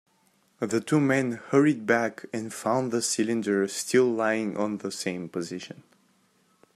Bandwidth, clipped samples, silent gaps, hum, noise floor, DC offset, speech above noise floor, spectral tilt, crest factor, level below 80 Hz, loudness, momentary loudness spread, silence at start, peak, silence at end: 14.5 kHz; under 0.1%; none; none; -66 dBFS; under 0.1%; 40 dB; -4.5 dB/octave; 20 dB; -74 dBFS; -26 LUFS; 12 LU; 0.6 s; -8 dBFS; 1.05 s